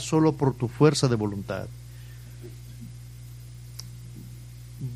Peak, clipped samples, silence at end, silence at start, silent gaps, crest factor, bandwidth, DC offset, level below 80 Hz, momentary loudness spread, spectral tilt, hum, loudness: -6 dBFS; under 0.1%; 0 s; 0 s; none; 22 dB; 15.5 kHz; under 0.1%; -50 dBFS; 22 LU; -6 dB/octave; 60 Hz at -45 dBFS; -25 LUFS